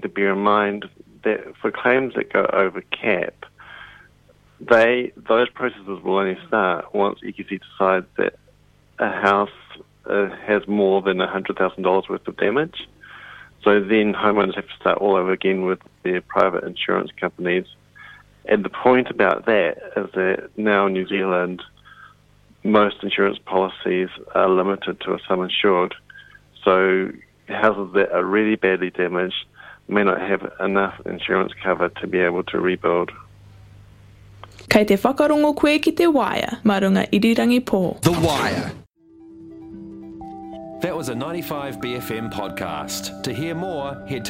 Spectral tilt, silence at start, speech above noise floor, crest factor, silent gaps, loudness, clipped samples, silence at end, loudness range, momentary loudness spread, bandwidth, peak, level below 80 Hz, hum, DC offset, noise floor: -5.5 dB/octave; 0 s; 35 dB; 20 dB; none; -20 LUFS; under 0.1%; 0 s; 5 LU; 13 LU; 16.5 kHz; 0 dBFS; -54 dBFS; none; under 0.1%; -55 dBFS